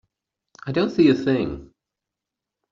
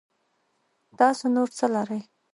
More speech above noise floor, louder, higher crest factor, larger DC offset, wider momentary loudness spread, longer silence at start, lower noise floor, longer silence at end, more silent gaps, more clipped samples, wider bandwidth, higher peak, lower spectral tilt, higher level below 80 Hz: first, 66 dB vs 48 dB; first, -21 LUFS vs -24 LUFS; about the same, 18 dB vs 20 dB; neither; first, 18 LU vs 10 LU; second, 0.65 s vs 1 s; first, -86 dBFS vs -72 dBFS; first, 1.05 s vs 0.3 s; neither; neither; second, 7.4 kHz vs 11.5 kHz; about the same, -6 dBFS vs -6 dBFS; about the same, -6 dB/octave vs -5 dB/octave; first, -52 dBFS vs -78 dBFS